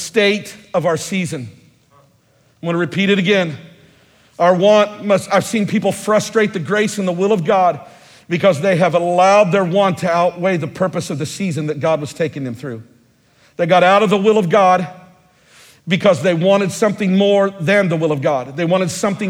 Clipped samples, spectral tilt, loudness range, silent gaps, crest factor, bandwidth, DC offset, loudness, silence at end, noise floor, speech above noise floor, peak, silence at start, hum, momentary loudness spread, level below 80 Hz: under 0.1%; -5.5 dB/octave; 5 LU; none; 16 dB; 16 kHz; under 0.1%; -15 LUFS; 0 s; -55 dBFS; 40 dB; 0 dBFS; 0 s; none; 11 LU; -60 dBFS